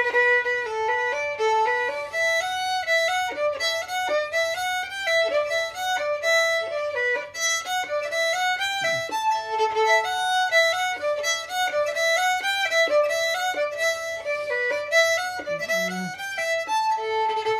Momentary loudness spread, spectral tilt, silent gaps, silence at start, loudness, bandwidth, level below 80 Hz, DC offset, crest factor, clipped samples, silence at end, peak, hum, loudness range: 6 LU; -0.5 dB/octave; none; 0 s; -23 LUFS; 15.5 kHz; -64 dBFS; under 0.1%; 16 dB; under 0.1%; 0 s; -8 dBFS; none; 2 LU